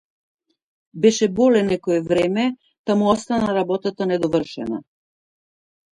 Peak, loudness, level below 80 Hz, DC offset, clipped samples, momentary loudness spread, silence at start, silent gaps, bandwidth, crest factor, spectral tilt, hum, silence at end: -4 dBFS; -20 LUFS; -56 dBFS; under 0.1%; under 0.1%; 11 LU; 0.95 s; 2.79-2.84 s; 11 kHz; 18 dB; -5.5 dB/octave; none; 1.1 s